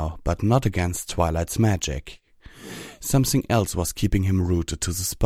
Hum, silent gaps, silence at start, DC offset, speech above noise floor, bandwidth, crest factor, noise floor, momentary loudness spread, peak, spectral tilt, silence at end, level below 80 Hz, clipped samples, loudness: none; none; 0 s; under 0.1%; 21 dB; 16.5 kHz; 18 dB; -44 dBFS; 12 LU; -6 dBFS; -5.5 dB/octave; 0 s; -34 dBFS; under 0.1%; -23 LUFS